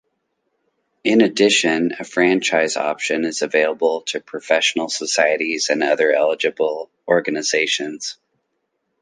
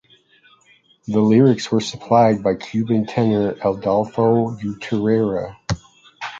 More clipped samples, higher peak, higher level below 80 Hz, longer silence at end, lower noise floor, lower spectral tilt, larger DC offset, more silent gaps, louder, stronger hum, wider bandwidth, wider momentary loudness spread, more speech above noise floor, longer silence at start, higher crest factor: neither; about the same, -2 dBFS vs -2 dBFS; second, -70 dBFS vs -50 dBFS; first, 0.9 s vs 0 s; first, -73 dBFS vs -55 dBFS; second, -2.5 dB/octave vs -7 dB/octave; neither; neither; about the same, -18 LUFS vs -19 LUFS; neither; first, 10 kHz vs 7.8 kHz; second, 9 LU vs 13 LU; first, 54 dB vs 38 dB; about the same, 1.05 s vs 1.1 s; about the same, 18 dB vs 18 dB